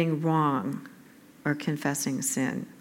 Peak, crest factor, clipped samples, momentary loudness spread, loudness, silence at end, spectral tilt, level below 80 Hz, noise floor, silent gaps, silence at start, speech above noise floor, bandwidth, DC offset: -12 dBFS; 16 dB; under 0.1%; 10 LU; -28 LUFS; 0 s; -5 dB/octave; -78 dBFS; -53 dBFS; none; 0 s; 25 dB; 17 kHz; under 0.1%